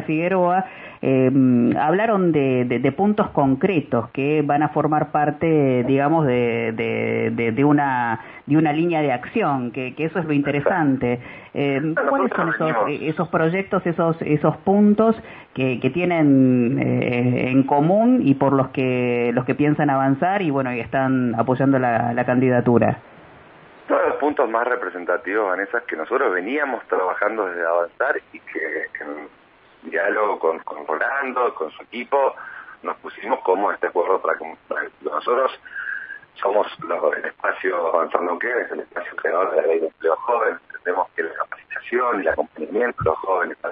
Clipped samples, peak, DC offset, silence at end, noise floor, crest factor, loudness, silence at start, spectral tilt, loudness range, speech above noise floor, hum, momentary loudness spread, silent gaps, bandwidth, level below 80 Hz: under 0.1%; -2 dBFS; under 0.1%; 0 s; -46 dBFS; 18 dB; -20 LUFS; 0 s; -11.5 dB/octave; 5 LU; 26 dB; none; 10 LU; none; 4 kHz; -58 dBFS